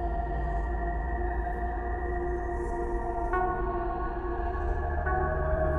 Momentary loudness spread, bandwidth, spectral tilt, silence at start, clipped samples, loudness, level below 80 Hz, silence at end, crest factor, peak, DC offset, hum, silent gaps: 4 LU; 3.5 kHz; -9.5 dB/octave; 0 s; under 0.1%; -32 LUFS; -32 dBFS; 0 s; 14 dB; -14 dBFS; under 0.1%; none; none